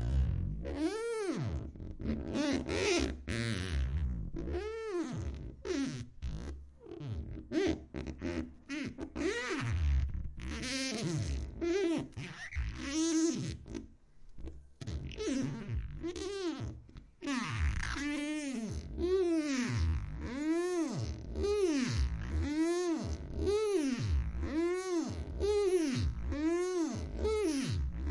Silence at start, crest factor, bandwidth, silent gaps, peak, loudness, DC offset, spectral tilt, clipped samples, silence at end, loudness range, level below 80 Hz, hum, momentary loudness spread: 0 s; 16 dB; 11.5 kHz; none; -18 dBFS; -36 LUFS; under 0.1%; -5.5 dB/octave; under 0.1%; 0 s; 6 LU; -42 dBFS; none; 11 LU